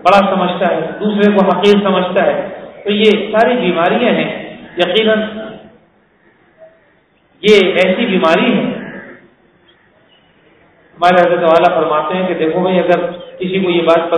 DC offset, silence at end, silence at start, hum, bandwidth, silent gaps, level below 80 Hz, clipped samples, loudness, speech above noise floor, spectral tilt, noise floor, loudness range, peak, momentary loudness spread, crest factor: under 0.1%; 0 s; 0 s; none; 11 kHz; none; -54 dBFS; 0.3%; -12 LUFS; 41 dB; -6.5 dB/octave; -53 dBFS; 5 LU; 0 dBFS; 13 LU; 14 dB